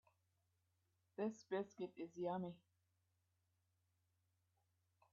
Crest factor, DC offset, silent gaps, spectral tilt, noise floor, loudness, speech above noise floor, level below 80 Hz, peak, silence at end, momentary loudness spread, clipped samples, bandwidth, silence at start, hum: 20 dB; under 0.1%; none; -6.5 dB/octave; -85 dBFS; -48 LUFS; 38 dB; under -90 dBFS; -32 dBFS; 2.55 s; 9 LU; under 0.1%; 7 kHz; 1.2 s; none